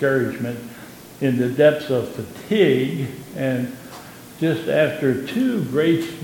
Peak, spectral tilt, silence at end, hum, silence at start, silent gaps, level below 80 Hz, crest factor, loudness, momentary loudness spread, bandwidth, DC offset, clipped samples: -4 dBFS; -6.5 dB/octave; 0 s; none; 0 s; none; -60 dBFS; 18 dB; -21 LUFS; 20 LU; 17.5 kHz; under 0.1%; under 0.1%